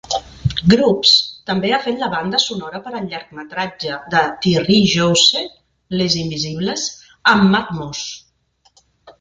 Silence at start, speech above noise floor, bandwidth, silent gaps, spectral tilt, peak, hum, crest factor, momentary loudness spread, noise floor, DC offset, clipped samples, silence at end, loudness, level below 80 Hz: 0.05 s; 43 dB; 9.4 kHz; none; -4 dB/octave; 0 dBFS; none; 18 dB; 15 LU; -59 dBFS; under 0.1%; under 0.1%; 0.1 s; -16 LUFS; -44 dBFS